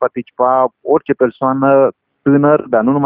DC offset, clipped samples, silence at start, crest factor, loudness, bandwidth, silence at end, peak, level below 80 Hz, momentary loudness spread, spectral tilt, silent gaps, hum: under 0.1%; under 0.1%; 0 s; 12 dB; -14 LUFS; 3.6 kHz; 0 s; 0 dBFS; -56 dBFS; 6 LU; -12.5 dB/octave; none; none